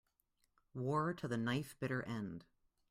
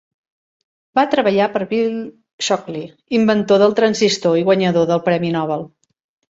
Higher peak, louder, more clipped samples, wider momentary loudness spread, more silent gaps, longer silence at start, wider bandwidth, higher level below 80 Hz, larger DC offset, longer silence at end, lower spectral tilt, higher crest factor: second, -24 dBFS vs -2 dBFS; second, -41 LUFS vs -17 LUFS; neither; about the same, 11 LU vs 12 LU; second, none vs 2.33-2.38 s; second, 0.75 s vs 0.95 s; first, 15.5 kHz vs 8 kHz; second, -72 dBFS vs -60 dBFS; neither; about the same, 0.5 s vs 0.6 s; first, -6.5 dB/octave vs -5 dB/octave; about the same, 18 dB vs 16 dB